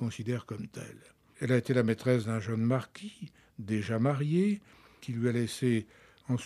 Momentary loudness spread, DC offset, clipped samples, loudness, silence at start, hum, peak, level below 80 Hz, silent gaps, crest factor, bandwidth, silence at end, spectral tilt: 18 LU; under 0.1%; under 0.1%; -31 LUFS; 0 s; none; -12 dBFS; -70 dBFS; none; 20 dB; 13.5 kHz; 0 s; -7 dB/octave